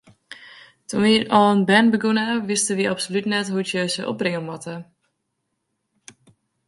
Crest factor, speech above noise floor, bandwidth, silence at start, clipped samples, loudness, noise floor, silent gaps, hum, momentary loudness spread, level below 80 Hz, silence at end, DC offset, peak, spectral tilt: 22 dB; 56 dB; 11.5 kHz; 0.3 s; under 0.1%; -20 LUFS; -76 dBFS; none; none; 18 LU; -64 dBFS; 1.85 s; under 0.1%; -2 dBFS; -4 dB/octave